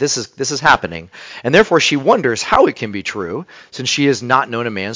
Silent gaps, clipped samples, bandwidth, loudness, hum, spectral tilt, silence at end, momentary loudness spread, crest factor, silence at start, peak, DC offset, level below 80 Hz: none; 0.1%; 8 kHz; -15 LUFS; none; -3.5 dB/octave; 0 s; 14 LU; 16 dB; 0 s; 0 dBFS; under 0.1%; -46 dBFS